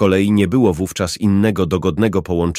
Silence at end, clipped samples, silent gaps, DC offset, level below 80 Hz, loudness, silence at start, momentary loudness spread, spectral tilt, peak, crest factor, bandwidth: 0 s; under 0.1%; none; under 0.1%; -38 dBFS; -16 LUFS; 0 s; 5 LU; -6.5 dB/octave; -2 dBFS; 14 dB; 15.5 kHz